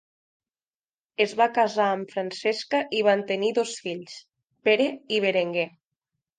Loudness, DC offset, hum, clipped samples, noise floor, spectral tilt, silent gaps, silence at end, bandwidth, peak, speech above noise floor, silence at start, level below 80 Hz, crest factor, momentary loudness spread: -25 LUFS; under 0.1%; none; under 0.1%; under -90 dBFS; -4 dB/octave; none; 0.7 s; 9.6 kHz; -8 dBFS; over 66 dB; 1.2 s; -80 dBFS; 18 dB; 11 LU